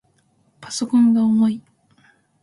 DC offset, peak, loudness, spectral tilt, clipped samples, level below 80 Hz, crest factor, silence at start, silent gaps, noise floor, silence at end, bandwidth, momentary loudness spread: under 0.1%; -8 dBFS; -18 LUFS; -5.5 dB/octave; under 0.1%; -66 dBFS; 12 dB; 0.6 s; none; -62 dBFS; 0.85 s; 11.5 kHz; 14 LU